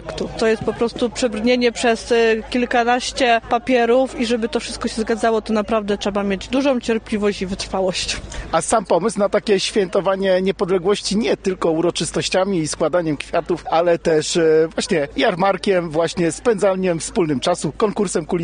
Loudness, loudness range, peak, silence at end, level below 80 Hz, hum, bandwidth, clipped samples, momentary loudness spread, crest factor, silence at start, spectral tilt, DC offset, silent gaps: -19 LUFS; 3 LU; -4 dBFS; 0 s; -42 dBFS; none; 10 kHz; under 0.1%; 5 LU; 14 dB; 0 s; -4.5 dB/octave; under 0.1%; none